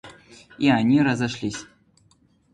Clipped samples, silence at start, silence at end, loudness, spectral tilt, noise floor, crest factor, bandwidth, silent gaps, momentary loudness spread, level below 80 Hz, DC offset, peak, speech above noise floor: under 0.1%; 0.05 s; 0.9 s; -21 LUFS; -6 dB/octave; -61 dBFS; 18 dB; 10.5 kHz; none; 13 LU; -56 dBFS; under 0.1%; -6 dBFS; 40 dB